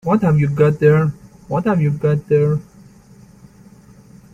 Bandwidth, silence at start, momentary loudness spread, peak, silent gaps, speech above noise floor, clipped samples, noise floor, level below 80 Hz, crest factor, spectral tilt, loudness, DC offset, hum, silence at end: 7.2 kHz; 0.05 s; 8 LU; -2 dBFS; none; 30 dB; under 0.1%; -45 dBFS; -48 dBFS; 16 dB; -9.5 dB/octave; -16 LUFS; under 0.1%; none; 1.7 s